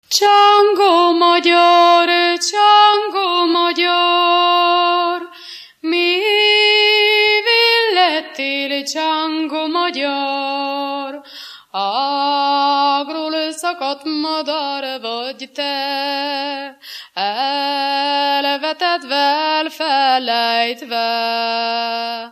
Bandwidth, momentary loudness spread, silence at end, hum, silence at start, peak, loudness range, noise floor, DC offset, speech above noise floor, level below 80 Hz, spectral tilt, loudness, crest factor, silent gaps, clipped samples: 15 kHz; 13 LU; 0 s; none; 0.1 s; 0 dBFS; 9 LU; -37 dBFS; under 0.1%; 19 dB; -78 dBFS; -0.5 dB/octave; -15 LUFS; 16 dB; none; under 0.1%